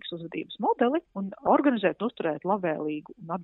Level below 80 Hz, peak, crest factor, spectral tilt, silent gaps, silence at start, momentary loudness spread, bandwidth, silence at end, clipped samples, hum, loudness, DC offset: -72 dBFS; -8 dBFS; 20 dB; -10 dB/octave; none; 0.05 s; 13 LU; 4.1 kHz; 0 s; under 0.1%; none; -28 LUFS; under 0.1%